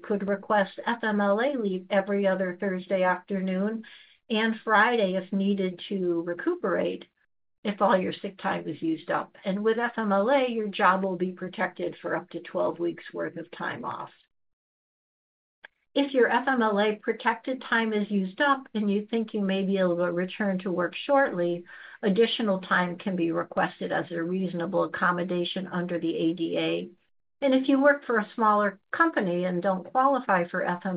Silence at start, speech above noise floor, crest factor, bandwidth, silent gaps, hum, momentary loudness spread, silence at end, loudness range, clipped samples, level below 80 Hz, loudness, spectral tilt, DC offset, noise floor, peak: 0.05 s; over 64 dB; 18 dB; 5 kHz; 7.58-7.63 s, 14.53-15.62 s; none; 9 LU; 0 s; 4 LU; under 0.1%; -74 dBFS; -27 LUFS; -4 dB/octave; under 0.1%; under -90 dBFS; -8 dBFS